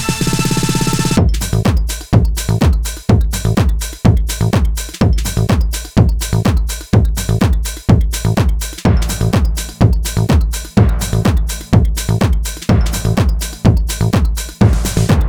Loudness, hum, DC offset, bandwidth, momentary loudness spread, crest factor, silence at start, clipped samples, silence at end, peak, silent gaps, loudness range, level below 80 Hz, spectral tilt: -15 LUFS; none; 0.1%; 19.5 kHz; 3 LU; 12 dB; 0 s; under 0.1%; 0 s; 0 dBFS; none; 1 LU; -18 dBFS; -5.5 dB/octave